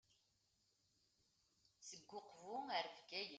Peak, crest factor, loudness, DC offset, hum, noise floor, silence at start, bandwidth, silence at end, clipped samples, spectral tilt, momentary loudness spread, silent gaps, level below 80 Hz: -30 dBFS; 22 dB; -50 LUFS; under 0.1%; none; -83 dBFS; 1.8 s; 9 kHz; 0 s; under 0.1%; -1.5 dB/octave; 13 LU; none; under -90 dBFS